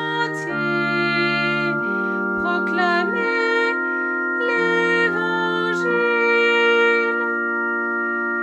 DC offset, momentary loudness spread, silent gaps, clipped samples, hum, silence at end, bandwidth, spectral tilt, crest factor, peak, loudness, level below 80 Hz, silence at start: under 0.1%; 6 LU; none; under 0.1%; none; 0 s; 10 kHz; -5.5 dB/octave; 14 dB; -6 dBFS; -19 LUFS; -64 dBFS; 0 s